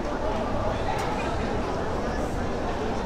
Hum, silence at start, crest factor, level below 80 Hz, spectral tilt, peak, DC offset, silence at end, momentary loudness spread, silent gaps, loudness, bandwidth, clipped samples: none; 0 s; 14 dB; -34 dBFS; -6 dB/octave; -12 dBFS; under 0.1%; 0 s; 2 LU; none; -28 LUFS; 14 kHz; under 0.1%